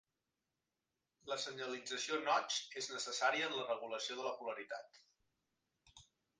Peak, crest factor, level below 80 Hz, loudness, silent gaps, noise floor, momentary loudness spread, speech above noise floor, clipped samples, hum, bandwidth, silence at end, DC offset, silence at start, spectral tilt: -22 dBFS; 22 dB; -86 dBFS; -40 LUFS; none; under -90 dBFS; 10 LU; over 49 dB; under 0.1%; none; 10 kHz; 0.35 s; under 0.1%; 1.25 s; -1 dB/octave